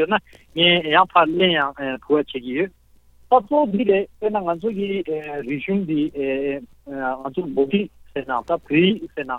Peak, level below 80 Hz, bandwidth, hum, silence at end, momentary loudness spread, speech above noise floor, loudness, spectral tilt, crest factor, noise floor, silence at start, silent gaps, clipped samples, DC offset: -2 dBFS; -54 dBFS; 5 kHz; none; 0 s; 12 LU; 31 dB; -21 LUFS; -7.5 dB/octave; 18 dB; -52 dBFS; 0 s; none; under 0.1%; under 0.1%